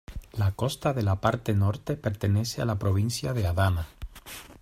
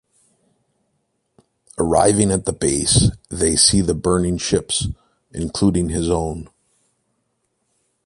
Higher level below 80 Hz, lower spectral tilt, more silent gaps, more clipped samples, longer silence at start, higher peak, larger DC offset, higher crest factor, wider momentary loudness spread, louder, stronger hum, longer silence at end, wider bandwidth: second, -46 dBFS vs -36 dBFS; first, -6 dB/octave vs -4 dB/octave; neither; neither; second, 0.1 s vs 1.8 s; second, -8 dBFS vs 0 dBFS; neither; about the same, 20 dB vs 20 dB; about the same, 14 LU vs 15 LU; second, -27 LUFS vs -18 LUFS; neither; second, 0.1 s vs 1.6 s; first, 15.5 kHz vs 11.5 kHz